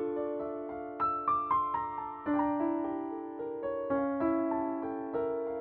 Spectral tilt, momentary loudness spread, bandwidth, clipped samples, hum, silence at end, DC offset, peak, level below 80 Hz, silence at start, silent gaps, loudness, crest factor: -6.5 dB/octave; 8 LU; 4.3 kHz; under 0.1%; none; 0 s; under 0.1%; -18 dBFS; -64 dBFS; 0 s; none; -33 LUFS; 16 dB